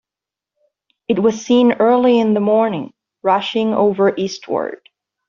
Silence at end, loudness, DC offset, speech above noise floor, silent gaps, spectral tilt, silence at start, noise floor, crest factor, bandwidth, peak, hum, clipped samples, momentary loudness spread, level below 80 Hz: 0.55 s; -16 LUFS; under 0.1%; 72 dB; none; -4.5 dB/octave; 1.1 s; -87 dBFS; 14 dB; 7.4 kHz; -2 dBFS; none; under 0.1%; 11 LU; -62 dBFS